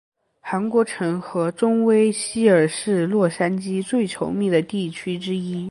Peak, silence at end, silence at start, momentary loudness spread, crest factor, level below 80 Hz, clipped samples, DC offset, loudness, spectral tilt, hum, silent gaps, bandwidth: -4 dBFS; 0 s; 0.45 s; 9 LU; 18 dB; -62 dBFS; under 0.1%; under 0.1%; -21 LUFS; -5.5 dB/octave; none; none; 11.5 kHz